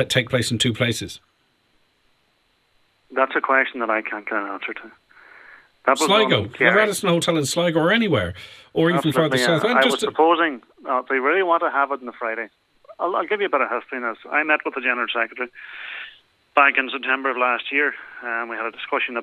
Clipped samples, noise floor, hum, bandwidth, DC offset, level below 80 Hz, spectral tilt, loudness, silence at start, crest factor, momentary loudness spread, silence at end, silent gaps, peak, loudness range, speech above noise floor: under 0.1%; -65 dBFS; none; 15 kHz; under 0.1%; -60 dBFS; -4 dB/octave; -20 LUFS; 0 s; 20 dB; 14 LU; 0 s; none; -2 dBFS; 6 LU; 44 dB